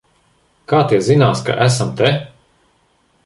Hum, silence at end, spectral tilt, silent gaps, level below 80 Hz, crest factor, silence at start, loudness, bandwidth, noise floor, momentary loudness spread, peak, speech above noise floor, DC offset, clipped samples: none; 1 s; -5.5 dB/octave; none; -52 dBFS; 16 dB; 0.7 s; -15 LUFS; 11.5 kHz; -59 dBFS; 4 LU; 0 dBFS; 45 dB; under 0.1%; under 0.1%